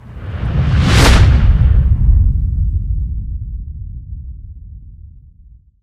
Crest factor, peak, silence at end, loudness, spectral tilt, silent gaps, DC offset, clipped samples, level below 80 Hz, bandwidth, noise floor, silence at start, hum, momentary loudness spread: 14 dB; 0 dBFS; 0.65 s; -14 LUFS; -5.5 dB/octave; none; under 0.1%; under 0.1%; -16 dBFS; 13.5 kHz; -43 dBFS; 0.05 s; none; 21 LU